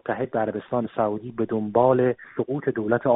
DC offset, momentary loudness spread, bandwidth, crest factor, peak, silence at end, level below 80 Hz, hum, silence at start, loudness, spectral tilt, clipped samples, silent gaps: under 0.1%; 8 LU; 4 kHz; 18 dB; -6 dBFS; 0 s; -60 dBFS; none; 0.05 s; -24 LUFS; -7.5 dB/octave; under 0.1%; none